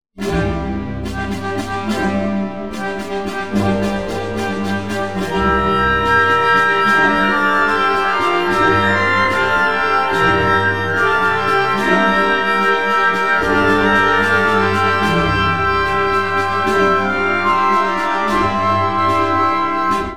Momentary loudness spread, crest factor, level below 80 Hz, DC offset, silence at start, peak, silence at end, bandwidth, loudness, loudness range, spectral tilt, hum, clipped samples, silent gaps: 9 LU; 14 dB; -36 dBFS; 2%; 0.1 s; 0 dBFS; 0 s; 17 kHz; -15 LUFS; 7 LU; -5.5 dB/octave; none; under 0.1%; none